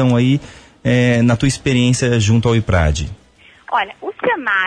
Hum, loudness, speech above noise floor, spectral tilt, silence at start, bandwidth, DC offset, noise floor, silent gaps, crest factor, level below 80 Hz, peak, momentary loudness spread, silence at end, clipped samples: none; -16 LUFS; 27 dB; -5.5 dB/octave; 0 s; 10.5 kHz; under 0.1%; -42 dBFS; none; 12 dB; -30 dBFS; -2 dBFS; 8 LU; 0 s; under 0.1%